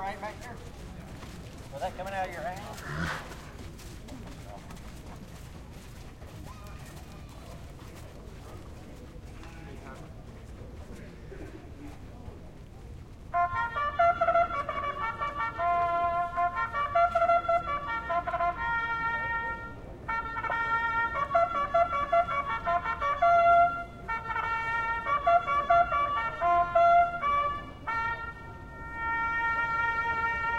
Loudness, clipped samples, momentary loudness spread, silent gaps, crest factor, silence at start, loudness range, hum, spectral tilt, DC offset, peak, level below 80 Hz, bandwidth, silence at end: -28 LUFS; under 0.1%; 22 LU; none; 18 dB; 0 s; 20 LU; none; -5.5 dB/octave; under 0.1%; -12 dBFS; -48 dBFS; 14.5 kHz; 0 s